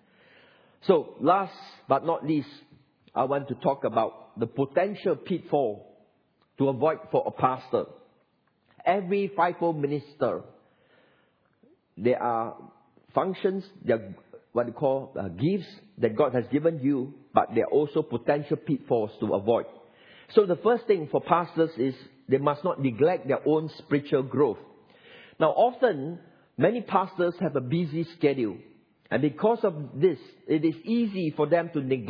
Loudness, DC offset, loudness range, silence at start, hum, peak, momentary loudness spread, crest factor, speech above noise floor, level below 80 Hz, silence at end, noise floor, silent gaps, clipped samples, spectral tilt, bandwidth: -27 LUFS; under 0.1%; 4 LU; 0.85 s; none; -4 dBFS; 8 LU; 24 dB; 43 dB; -72 dBFS; 0 s; -69 dBFS; none; under 0.1%; -10 dB/octave; 5.4 kHz